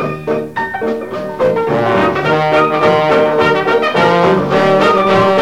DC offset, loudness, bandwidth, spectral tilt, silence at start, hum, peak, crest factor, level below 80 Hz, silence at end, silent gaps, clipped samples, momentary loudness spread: 0.6%; -12 LUFS; 15.5 kHz; -6.5 dB/octave; 0 s; none; 0 dBFS; 12 dB; -44 dBFS; 0 s; none; under 0.1%; 9 LU